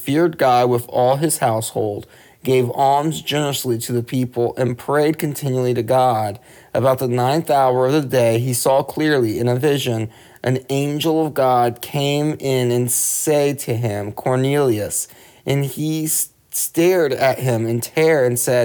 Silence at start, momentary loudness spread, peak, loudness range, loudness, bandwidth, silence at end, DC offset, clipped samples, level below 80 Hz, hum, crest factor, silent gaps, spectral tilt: 0 s; 7 LU; -4 dBFS; 2 LU; -18 LUFS; over 20 kHz; 0 s; under 0.1%; under 0.1%; -58 dBFS; none; 14 dB; none; -5 dB/octave